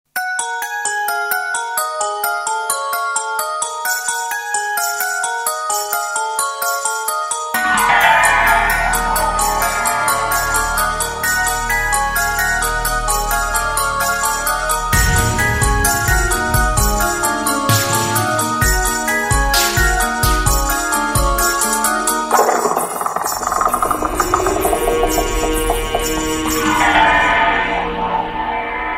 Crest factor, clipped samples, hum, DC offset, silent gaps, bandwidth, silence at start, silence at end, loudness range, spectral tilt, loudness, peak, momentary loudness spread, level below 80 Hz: 16 dB; under 0.1%; none; under 0.1%; none; 16.5 kHz; 0.15 s; 0 s; 4 LU; -2.5 dB/octave; -16 LUFS; 0 dBFS; 6 LU; -26 dBFS